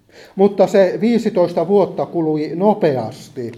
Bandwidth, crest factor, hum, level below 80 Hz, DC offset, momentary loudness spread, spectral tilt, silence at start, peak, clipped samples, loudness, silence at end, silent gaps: 13 kHz; 16 dB; none; -62 dBFS; under 0.1%; 10 LU; -7.5 dB/octave; 0.2 s; 0 dBFS; under 0.1%; -16 LUFS; 0 s; none